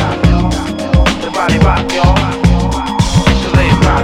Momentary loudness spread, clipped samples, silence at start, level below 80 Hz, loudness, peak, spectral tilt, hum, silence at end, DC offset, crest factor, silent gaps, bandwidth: 4 LU; 0.3%; 0 s; -16 dBFS; -12 LUFS; 0 dBFS; -6 dB/octave; none; 0 s; under 0.1%; 10 dB; none; 13.5 kHz